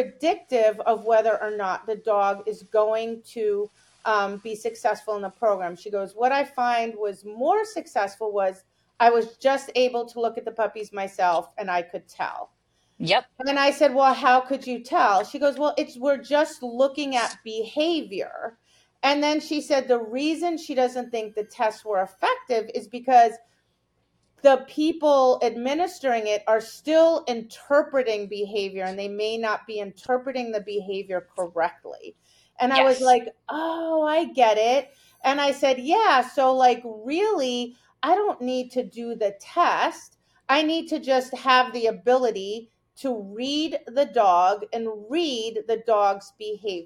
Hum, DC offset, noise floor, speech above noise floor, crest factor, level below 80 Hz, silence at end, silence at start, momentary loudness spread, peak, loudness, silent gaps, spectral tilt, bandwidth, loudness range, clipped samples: none; under 0.1%; -71 dBFS; 47 dB; 20 dB; -74 dBFS; 0 s; 0 s; 12 LU; -4 dBFS; -24 LUFS; none; -3.5 dB/octave; 15 kHz; 5 LU; under 0.1%